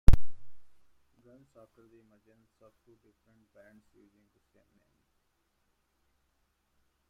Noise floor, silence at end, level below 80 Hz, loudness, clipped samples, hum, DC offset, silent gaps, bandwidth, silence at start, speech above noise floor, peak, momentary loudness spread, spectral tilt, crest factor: -77 dBFS; 6.5 s; -36 dBFS; -31 LUFS; under 0.1%; none; under 0.1%; none; 6 kHz; 0.1 s; 13 dB; -4 dBFS; 29 LU; -7.5 dB/octave; 26 dB